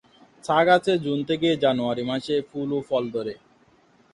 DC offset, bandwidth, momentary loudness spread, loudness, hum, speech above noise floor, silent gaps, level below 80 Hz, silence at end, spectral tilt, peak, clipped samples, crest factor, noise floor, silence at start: under 0.1%; 11 kHz; 12 LU; -23 LUFS; none; 36 dB; none; -62 dBFS; 0.75 s; -6 dB/octave; -6 dBFS; under 0.1%; 18 dB; -59 dBFS; 0.45 s